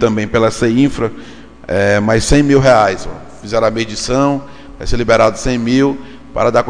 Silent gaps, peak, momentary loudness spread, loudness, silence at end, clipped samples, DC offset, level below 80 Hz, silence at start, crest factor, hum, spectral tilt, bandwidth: none; 0 dBFS; 16 LU; -13 LUFS; 0 s; under 0.1%; under 0.1%; -28 dBFS; 0 s; 14 dB; none; -5.5 dB/octave; 10 kHz